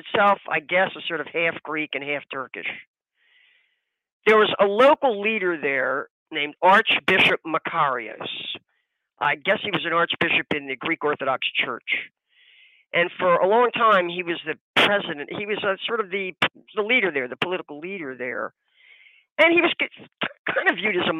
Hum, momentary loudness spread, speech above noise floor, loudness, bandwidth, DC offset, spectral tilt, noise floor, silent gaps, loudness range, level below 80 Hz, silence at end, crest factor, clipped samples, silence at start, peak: none; 13 LU; 51 dB; -22 LUFS; 15 kHz; under 0.1%; -5 dB/octave; -74 dBFS; 2.87-2.94 s, 4.12-4.20 s, 6.10-6.26 s, 14.61-14.74 s, 19.32-19.36 s, 20.39-20.45 s; 6 LU; -72 dBFS; 0 s; 18 dB; under 0.1%; 0.05 s; -6 dBFS